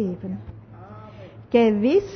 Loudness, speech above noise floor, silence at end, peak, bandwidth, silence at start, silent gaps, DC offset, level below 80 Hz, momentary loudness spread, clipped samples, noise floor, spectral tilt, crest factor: -21 LUFS; 22 dB; 0 s; -6 dBFS; 6.4 kHz; 0 s; none; under 0.1%; -52 dBFS; 25 LU; under 0.1%; -42 dBFS; -8 dB/octave; 18 dB